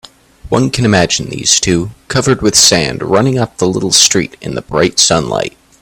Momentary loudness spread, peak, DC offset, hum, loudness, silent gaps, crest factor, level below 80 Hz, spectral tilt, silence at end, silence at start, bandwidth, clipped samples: 10 LU; 0 dBFS; under 0.1%; none; -11 LUFS; none; 12 dB; -38 dBFS; -3 dB/octave; 0.3 s; 0.45 s; over 20 kHz; 0.2%